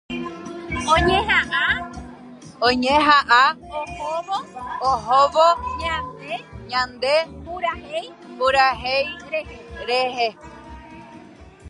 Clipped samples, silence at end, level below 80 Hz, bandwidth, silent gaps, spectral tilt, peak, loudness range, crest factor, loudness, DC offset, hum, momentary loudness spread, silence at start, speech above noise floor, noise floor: under 0.1%; 0 s; -42 dBFS; 11.5 kHz; none; -4 dB/octave; -2 dBFS; 5 LU; 20 dB; -20 LUFS; under 0.1%; none; 19 LU; 0.1 s; 24 dB; -44 dBFS